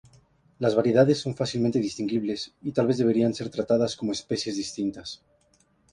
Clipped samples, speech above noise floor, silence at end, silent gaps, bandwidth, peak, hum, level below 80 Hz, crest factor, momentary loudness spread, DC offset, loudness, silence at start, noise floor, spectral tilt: under 0.1%; 40 dB; 0.8 s; none; 11 kHz; -6 dBFS; none; -60 dBFS; 20 dB; 10 LU; under 0.1%; -26 LUFS; 0.6 s; -65 dBFS; -6 dB/octave